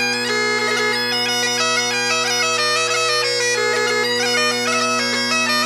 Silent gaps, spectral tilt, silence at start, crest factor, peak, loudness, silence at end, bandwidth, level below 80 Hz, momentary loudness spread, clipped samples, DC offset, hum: none; -1 dB/octave; 0 s; 12 dB; -6 dBFS; -17 LUFS; 0 s; 16 kHz; -70 dBFS; 1 LU; under 0.1%; under 0.1%; none